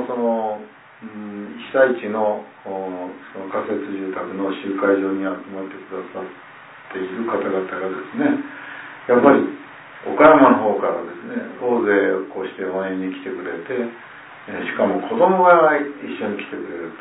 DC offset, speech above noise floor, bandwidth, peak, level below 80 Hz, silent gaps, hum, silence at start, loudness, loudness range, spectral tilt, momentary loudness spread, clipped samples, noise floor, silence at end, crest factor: under 0.1%; 20 dB; 4 kHz; 0 dBFS; -62 dBFS; none; none; 0 s; -20 LUFS; 9 LU; -10.5 dB/octave; 20 LU; under 0.1%; -40 dBFS; 0 s; 20 dB